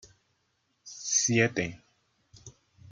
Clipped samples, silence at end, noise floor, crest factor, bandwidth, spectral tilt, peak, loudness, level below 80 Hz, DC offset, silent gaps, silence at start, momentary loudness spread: under 0.1%; 0.45 s; -75 dBFS; 24 dB; 10.5 kHz; -3 dB/octave; -8 dBFS; -27 LUFS; -66 dBFS; under 0.1%; none; 0.85 s; 15 LU